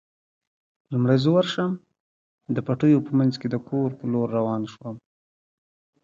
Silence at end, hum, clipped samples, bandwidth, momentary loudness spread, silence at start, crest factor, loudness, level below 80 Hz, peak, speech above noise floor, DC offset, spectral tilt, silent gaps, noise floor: 1.05 s; none; under 0.1%; 7.6 kHz; 15 LU; 0.9 s; 18 dB; -23 LUFS; -64 dBFS; -8 dBFS; over 68 dB; under 0.1%; -8 dB/octave; 2.00-2.38 s; under -90 dBFS